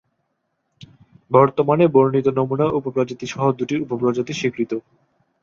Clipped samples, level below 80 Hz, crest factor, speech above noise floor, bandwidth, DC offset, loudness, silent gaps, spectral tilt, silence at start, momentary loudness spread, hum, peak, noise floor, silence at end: under 0.1%; -60 dBFS; 18 dB; 54 dB; 7.4 kHz; under 0.1%; -19 LUFS; none; -7 dB/octave; 1.3 s; 9 LU; none; -2 dBFS; -72 dBFS; 0.65 s